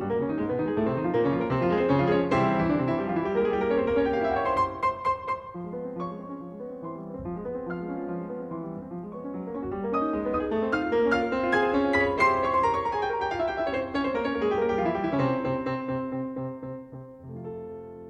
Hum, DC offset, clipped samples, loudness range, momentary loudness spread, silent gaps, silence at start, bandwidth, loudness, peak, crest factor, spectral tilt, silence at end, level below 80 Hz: none; under 0.1%; under 0.1%; 10 LU; 14 LU; none; 0 s; 9.2 kHz; -27 LUFS; -10 dBFS; 16 dB; -7.5 dB/octave; 0 s; -52 dBFS